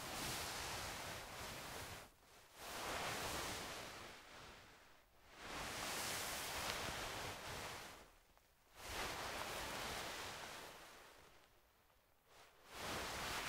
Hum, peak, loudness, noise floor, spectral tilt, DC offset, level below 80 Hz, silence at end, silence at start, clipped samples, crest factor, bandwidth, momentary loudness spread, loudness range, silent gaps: none; -22 dBFS; -47 LUFS; -74 dBFS; -2 dB/octave; under 0.1%; -66 dBFS; 0 s; 0 s; under 0.1%; 28 dB; 16 kHz; 19 LU; 4 LU; none